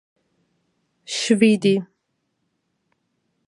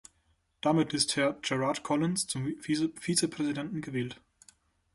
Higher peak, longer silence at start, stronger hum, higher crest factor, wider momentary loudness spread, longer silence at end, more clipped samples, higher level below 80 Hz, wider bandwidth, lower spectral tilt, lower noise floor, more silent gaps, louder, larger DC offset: first, -4 dBFS vs -10 dBFS; first, 1.1 s vs 0.65 s; neither; about the same, 20 dB vs 20 dB; about the same, 10 LU vs 8 LU; first, 1.65 s vs 0.8 s; neither; second, -74 dBFS vs -66 dBFS; about the same, 11.5 kHz vs 12 kHz; about the same, -5 dB/octave vs -4 dB/octave; about the same, -74 dBFS vs -72 dBFS; neither; first, -19 LUFS vs -30 LUFS; neither